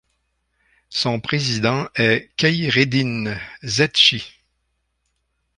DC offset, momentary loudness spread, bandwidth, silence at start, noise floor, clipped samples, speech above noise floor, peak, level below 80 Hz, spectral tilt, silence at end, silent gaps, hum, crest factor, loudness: under 0.1%; 13 LU; 11 kHz; 0.9 s; -71 dBFS; under 0.1%; 52 dB; -2 dBFS; -54 dBFS; -4 dB/octave; 1.3 s; none; none; 20 dB; -18 LUFS